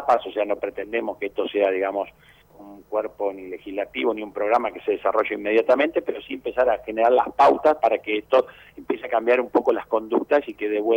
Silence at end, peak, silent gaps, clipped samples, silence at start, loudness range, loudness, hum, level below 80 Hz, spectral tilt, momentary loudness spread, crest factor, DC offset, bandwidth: 0 s; -8 dBFS; none; under 0.1%; 0 s; 6 LU; -23 LUFS; none; -60 dBFS; -5.5 dB/octave; 10 LU; 14 dB; under 0.1%; 16.5 kHz